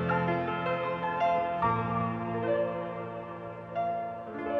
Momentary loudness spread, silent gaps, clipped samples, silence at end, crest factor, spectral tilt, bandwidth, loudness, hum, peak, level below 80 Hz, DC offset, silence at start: 10 LU; none; under 0.1%; 0 s; 16 dB; -8.5 dB/octave; 6 kHz; -31 LUFS; none; -14 dBFS; -58 dBFS; under 0.1%; 0 s